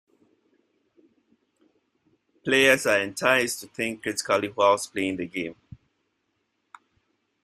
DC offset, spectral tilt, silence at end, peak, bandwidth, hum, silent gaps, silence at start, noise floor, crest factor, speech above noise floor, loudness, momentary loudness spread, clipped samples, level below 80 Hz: under 0.1%; -3 dB/octave; 1.9 s; -4 dBFS; 14.5 kHz; none; none; 2.45 s; -75 dBFS; 24 dB; 51 dB; -23 LUFS; 13 LU; under 0.1%; -66 dBFS